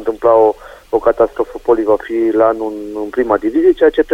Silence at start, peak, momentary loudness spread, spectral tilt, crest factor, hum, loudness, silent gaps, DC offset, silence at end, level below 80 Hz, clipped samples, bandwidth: 0 s; 0 dBFS; 10 LU; -7 dB/octave; 14 dB; none; -14 LUFS; none; under 0.1%; 0 s; -42 dBFS; under 0.1%; 8.8 kHz